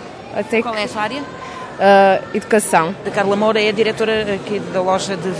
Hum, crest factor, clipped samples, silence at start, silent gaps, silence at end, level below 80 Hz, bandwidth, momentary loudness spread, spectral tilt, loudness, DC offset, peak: none; 16 dB; under 0.1%; 0 s; none; 0 s; -52 dBFS; 11 kHz; 14 LU; -4.5 dB/octave; -16 LUFS; under 0.1%; -2 dBFS